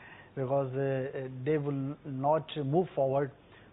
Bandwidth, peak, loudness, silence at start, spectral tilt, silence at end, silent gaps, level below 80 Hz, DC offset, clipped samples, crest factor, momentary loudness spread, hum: 4 kHz; -16 dBFS; -32 LUFS; 0 s; -11.5 dB/octave; 0.1 s; none; -68 dBFS; under 0.1%; under 0.1%; 16 dB; 8 LU; none